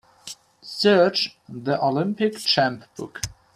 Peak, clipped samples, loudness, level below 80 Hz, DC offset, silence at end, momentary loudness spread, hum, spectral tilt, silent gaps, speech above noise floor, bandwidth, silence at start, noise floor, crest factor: -4 dBFS; under 0.1%; -22 LUFS; -54 dBFS; under 0.1%; 0.3 s; 21 LU; none; -4.5 dB/octave; none; 21 dB; 15.5 kHz; 0.25 s; -43 dBFS; 18 dB